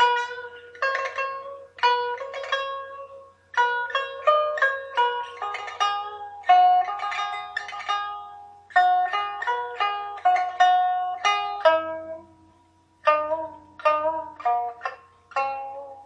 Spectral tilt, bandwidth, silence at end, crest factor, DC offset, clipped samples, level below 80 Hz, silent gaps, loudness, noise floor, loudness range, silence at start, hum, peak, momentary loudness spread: -1 dB/octave; 8.2 kHz; 0 s; 20 dB; under 0.1%; under 0.1%; -74 dBFS; none; -24 LUFS; -60 dBFS; 4 LU; 0 s; none; -4 dBFS; 15 LU